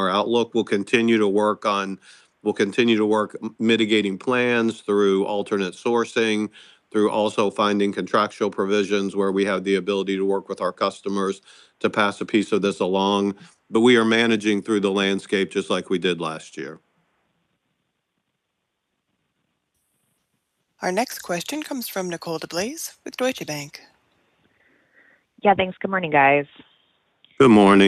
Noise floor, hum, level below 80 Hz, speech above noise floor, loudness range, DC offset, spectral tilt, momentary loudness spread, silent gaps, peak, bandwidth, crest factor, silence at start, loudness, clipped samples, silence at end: -77 dBFS; none; -64 dBFS; 56 dB; 10 LU; under 0.1%; -5 dB/octave; 11 LU; none; -4 dBFS; 14.5 kHz; 18 dB; 0 s; -21 LUFS; under 0.1%; 0 s